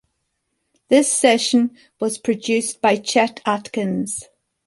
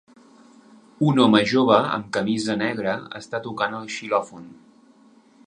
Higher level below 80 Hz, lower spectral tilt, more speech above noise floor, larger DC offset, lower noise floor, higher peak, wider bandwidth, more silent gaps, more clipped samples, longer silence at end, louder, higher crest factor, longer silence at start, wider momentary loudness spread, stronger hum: about the same, -64 dBFS vs -64 dBFS; second, -3 dB/octave vs -5.5 dB/octave; first, 54 dB vs 32 dB; neither; first, -73 dBFS vs -54 dBFS; about the same, -2 dBFS vs -2 dBFS; about the same, 11.5 kHz vs 10.5 kHz; neither; neither; second, 0.45 s vs 0.95 s; first, -19 LUFS vs -22 LUFS; about the same, 18 dB vs 22 dB; about the same, 0.9 s vs 1 s; second, 10 LU vs 14 LU; neither